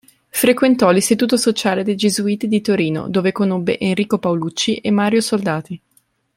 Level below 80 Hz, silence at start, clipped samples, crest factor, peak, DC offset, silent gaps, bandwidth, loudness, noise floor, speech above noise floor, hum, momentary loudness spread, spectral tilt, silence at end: -58 dBFS; 0.35 s; under 0.1%; 16 dB; 0 dBFS; under 0.1%; none; 16.5 kHz; -17 LUFS; -60 dBFS; 44 dB; none; 6 LU; -4.5 dB/octave; 0.6 s